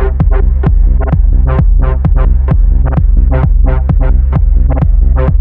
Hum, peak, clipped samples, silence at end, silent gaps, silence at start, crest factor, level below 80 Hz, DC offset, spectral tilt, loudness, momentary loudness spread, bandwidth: none; 0 dBFS; under 0.1%; 0 s; none; 0 s; 6 dB; -8 dBFS; 0.4%; -12 dB/octave; -11 LUFS; 1 LU; 2.9 kHz